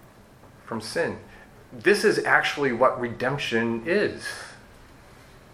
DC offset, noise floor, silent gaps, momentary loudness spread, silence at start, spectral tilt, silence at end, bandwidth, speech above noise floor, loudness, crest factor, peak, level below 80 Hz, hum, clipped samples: under 0.1%; -51 dBFS; none; 16 LU; 0.45 s; -4.5 dB/octave; 0.95 s; 15 kHz; 26 dB; -24 LUFS; 22 dB; -4 dBFS; -56 dBFS; none; under 0.1%